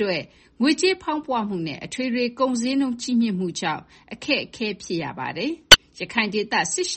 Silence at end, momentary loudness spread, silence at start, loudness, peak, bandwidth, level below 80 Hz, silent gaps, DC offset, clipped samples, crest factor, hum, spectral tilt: 0 s; 15 LU; 0 s; -21 LUFS; 0 dBFS; 8.8 kHz; -46 dBFS; none; under 0.1%; under 0.1%; 22 dB; none; -2.5 dB/octave